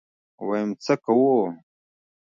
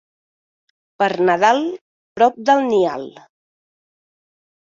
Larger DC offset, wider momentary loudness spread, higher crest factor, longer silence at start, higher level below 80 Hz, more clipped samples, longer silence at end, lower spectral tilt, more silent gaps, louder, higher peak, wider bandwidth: neither; second, 14 LU vs 20 LU; about the same, 16 dB vs 18 dB; second, 0.4 s vs 1 s; second, -76 dBFS vs -66 dBFS; neither; second, 0.8 s vs 1.6 s; first, -7 dB/octave vs -5 dB/octave; second, none vs 1.81-2.16 s; second, -23 LUFS vs -17 LUFS; second, -8 dBFS vs -2 dBFS; about the same, 7.6 kHz vs 7.6 kHz